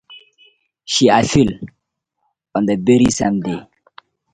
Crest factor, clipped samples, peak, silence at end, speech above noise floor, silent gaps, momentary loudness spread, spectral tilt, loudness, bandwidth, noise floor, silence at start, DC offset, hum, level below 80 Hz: 18 dB; under 0.1%; 0 dBFS; 0.7 s; 59 dB; none; 15 LU; -5 dB/octave; -16 LUFS; 9.6 kHz; -74 dBFS; 0.1 s; under 0.1%; none; -44 dBFS